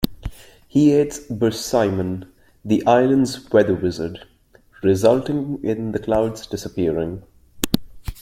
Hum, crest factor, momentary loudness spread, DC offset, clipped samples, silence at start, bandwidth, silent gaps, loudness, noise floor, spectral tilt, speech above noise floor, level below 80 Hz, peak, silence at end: none; 20 dB; 14 LU; under 0.1%; under 0.1%; 0 s; 16.5 kHz; none; -20 LUFS; -52 dBFS; -6 dB/octave; 33 dB; -42 dBFS; 0 dBFS; 0 s